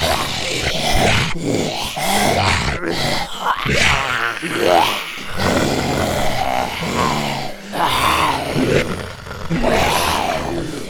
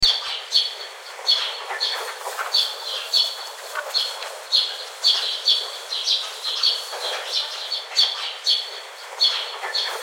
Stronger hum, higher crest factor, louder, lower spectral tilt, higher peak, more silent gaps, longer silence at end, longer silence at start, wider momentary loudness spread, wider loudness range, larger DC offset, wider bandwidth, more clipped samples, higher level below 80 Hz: neither; about the same, 16 dB vs 20 dB; first, -18 LUFS vs -21 LUFS; first, -3.5 dB/octave vs 2.5 dB/octave; about the same, -2 dBFS vs -4 dBFS; neither; about the same, 0 s vs 0 s; about the same, 0 s vs 0 s; about the same, 8 LU vs 10 LU; about the same, 2 LU vs 2 LU; neither; first, over 20 kHz vs 16.5 kHz; neither; first, -32 dBFS vs -56 dBFS